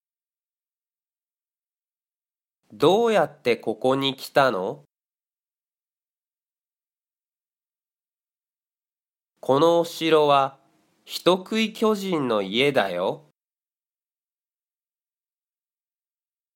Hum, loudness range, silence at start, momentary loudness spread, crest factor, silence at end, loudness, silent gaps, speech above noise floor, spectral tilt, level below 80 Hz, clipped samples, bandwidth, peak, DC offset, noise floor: none; 7 LU; 2.7 s; 10 LU; 22 dB; 3.4 s; -22 LUFS; 7.95-7.99 s; over 68 dB; -5 dB/octave; -74 dBFS; under 0.1%; 16.5 kHz; -4 dBFS; under 0.1%; under -90 dBFS